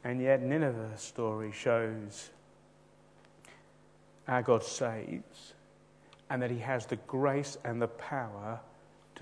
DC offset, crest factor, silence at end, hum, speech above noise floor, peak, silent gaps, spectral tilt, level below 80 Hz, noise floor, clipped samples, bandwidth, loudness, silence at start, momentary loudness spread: under 0.1%; 22 dB; 0 s; 50 Hz at -65 dBFS; 29 dB; -14 dBFS; none; -5.5 dB/octave; -74 dBFS; -62 dBFS; under 0.1%; 10.5 kHz; -34 LUFS; 0 s; 18 LU